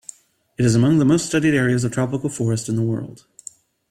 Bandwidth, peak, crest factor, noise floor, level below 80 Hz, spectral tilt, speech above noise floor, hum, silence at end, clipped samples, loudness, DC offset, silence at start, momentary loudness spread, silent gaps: 13.5 kHz; -6 dBFS; 14 dB; -44 dBFS; -52 dBFS; -6 dB/octave; 25 dB; none; 0.75 s; under 0.1%; -19 LUFS; under 0.1%; 0.6 s; 23 LU; none